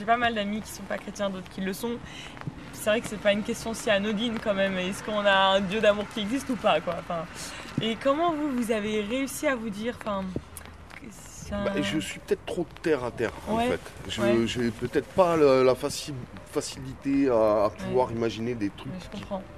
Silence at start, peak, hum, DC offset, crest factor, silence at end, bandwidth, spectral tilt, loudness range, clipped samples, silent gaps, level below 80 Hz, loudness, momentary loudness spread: 0 s; -6 dBFS; none; 0.2%; 20 dB; 0 s; 14.5 kHz; -4.5 dB/octave; 6 LU; under 0.1%; none; -52 dBFS; -27 LUFS; 14 LU